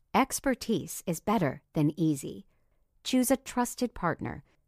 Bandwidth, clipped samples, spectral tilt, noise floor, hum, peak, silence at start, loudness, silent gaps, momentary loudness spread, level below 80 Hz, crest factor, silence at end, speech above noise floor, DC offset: 15.5 kHz; under 0.1%; -5 dB/octave; -68 dBFS; none; -12 dBFS; 0.15 s; -30 LUFS; none; 10 LU; -56 dBFS; 20 dB; 0.3 s; 39 dB; under 0.1%